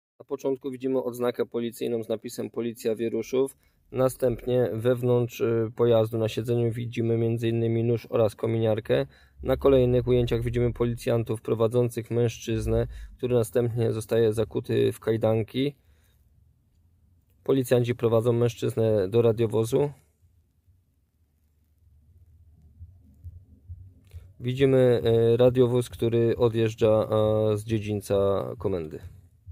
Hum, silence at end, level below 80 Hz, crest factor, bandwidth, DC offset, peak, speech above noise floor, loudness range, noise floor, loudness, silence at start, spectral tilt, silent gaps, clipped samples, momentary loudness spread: none; 0 s; -48 dBFS; 16 dB; 16 kHz; under 0.1%; -10 dBFS; 43 dB; 6 LU; -68 dBFS; -25 LUFS; 0.3 s; -7.5 dB/octave; none; under 0.1%; 9 LU